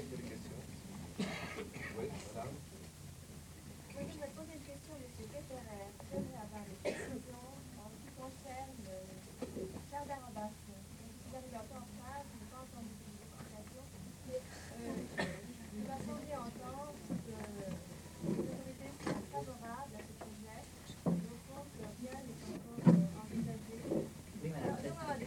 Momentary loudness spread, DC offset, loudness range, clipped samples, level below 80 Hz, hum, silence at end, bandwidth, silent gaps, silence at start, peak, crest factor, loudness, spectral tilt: 11 LU; under 0.1%; 12 LU; under 0.1%; -64 dBFS; none; 0 s; 17.5 kHz; none; 0 s; -14 dBFS; 28 dB; -44 LUFS; -6 dB/octave